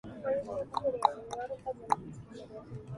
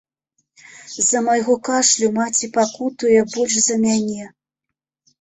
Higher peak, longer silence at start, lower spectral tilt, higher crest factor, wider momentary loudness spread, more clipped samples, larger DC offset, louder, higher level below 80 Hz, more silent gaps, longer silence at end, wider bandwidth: second, -8 dBFS vs -4 dBFS; second, 0.05 s vs 0.75 s; first, -5.5 dB/octave vs -2.5 dB/octave; first, 28 dB vs 16 dB; first, 17 LU vs 7 LU; neither; neither; second, -34 LUFS vs -17 LUFS; about the same, -62 dBFS vs -60 dBFS; neither; second, 0 s vs 0.95 s; first, 11.5 kHz vs 8.4 kHz